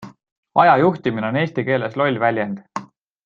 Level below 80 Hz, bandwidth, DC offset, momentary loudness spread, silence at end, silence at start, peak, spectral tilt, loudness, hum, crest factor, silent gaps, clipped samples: -62 dBFS; 7.4 kHz; under 0.1%; 14 LU; 0.4 s; 0 s; -2 dBFS; -7.5 dB/octave; -18 LUFS; none; 18 dB; 0.32-0.43 s; under 0.1%